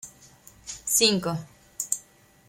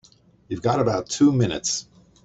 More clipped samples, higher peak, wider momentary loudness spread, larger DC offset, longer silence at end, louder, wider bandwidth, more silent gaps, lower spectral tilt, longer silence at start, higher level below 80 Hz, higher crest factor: neither; about the same, -4 dBFS vs -6 dBFS; first, 24 LU vs 9 LU; neither; about the same, 0.5 s vs 0.4 s; second, -25 LUFS vs -22 LUFS; first, 16.5 kHz vs 8.2 kHz; neither; second, -2 dB/octave vs -5 dB/octave; second, 0.05 s vs 0.5 s; second, -60 dBFS vs -54 dBFS; first, 24 dB vs 16 dB